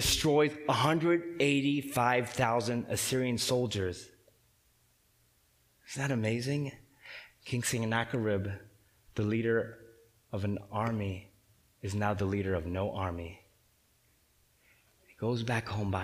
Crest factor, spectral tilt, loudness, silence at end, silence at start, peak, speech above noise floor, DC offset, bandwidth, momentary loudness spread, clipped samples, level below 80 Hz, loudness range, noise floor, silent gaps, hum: 22 dB; -5 dB/octave; -32 LUFS; 0 s; 0 s; -12 dBFS; 38 dB; under 0.1%; 15.5 kHz; 15 LU; under 0.1%; -56 dBFS; 9 LU; -69 dBFS; none; none